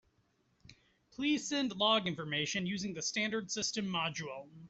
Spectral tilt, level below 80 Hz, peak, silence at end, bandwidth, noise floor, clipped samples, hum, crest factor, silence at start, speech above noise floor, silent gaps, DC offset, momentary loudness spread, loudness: -3 dB/octave; -72 dBFS; -16 dBFS; 0 s; 8.2 kHz; -75 dBFS; under 0.1%; none; 20 dB; 0.7 s; 39 dB; none; under 0.1%; 8 LU; -34 LUFS